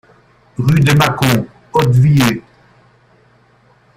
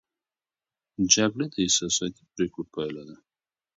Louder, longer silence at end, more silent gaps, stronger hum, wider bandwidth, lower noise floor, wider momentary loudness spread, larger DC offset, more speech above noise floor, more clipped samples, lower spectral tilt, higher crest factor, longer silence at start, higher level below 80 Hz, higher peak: first, -13 LUFS vs -25 LUFS; first, 1.55 s vs 0.65 s; neither; neither; first, 16 kHz vs 8 kHz; second, -51 dBFS vs under -90 dBFS; second, 8 LU vs 14 LU; neither; second, 40 dB vs over 63 dB; neither; first, -6 dB/octave vs -2.5 dB/octave; second, 14 dB vs 26 dB; second, 0.6 s vs 1 s; first, -42 dBFS vs -60 dBFS; about the same, 0 dBFS vs -2 dBFS